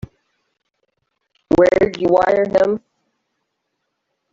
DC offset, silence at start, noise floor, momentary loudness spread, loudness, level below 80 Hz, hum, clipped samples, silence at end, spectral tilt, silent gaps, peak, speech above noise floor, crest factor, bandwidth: under 0.1%; 1.5 s; -74 dBFS; 6 LU; -16 LUFS; -48 dBFS; none; under 0.1%; 1.55 s; -7 dB/octave; none; -2 dBFS; 59 dB; 16 dB; 7.6 kHz